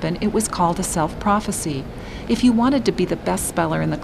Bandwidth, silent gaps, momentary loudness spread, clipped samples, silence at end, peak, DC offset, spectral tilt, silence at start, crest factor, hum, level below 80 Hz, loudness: 15 kHz; none; 8 LU; under 0.1%; 0 s; -4 dBFS; under 0.1%; -5 dB/octave; 0 s; 16 dB; none; -38 dBFS; -20 LUFS